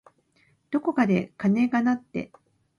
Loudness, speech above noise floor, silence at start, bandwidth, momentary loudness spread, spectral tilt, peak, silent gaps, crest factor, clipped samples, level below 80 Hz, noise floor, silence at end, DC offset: -25 LUFS; 41 dB; 0.7 s; 7 kHz; 13 LU; -8 dB/octave; -10 dBFS; none; 18 dB; under 0.1%; -64 dBFS; -65 dBFS; 0.55 s; under 0.1%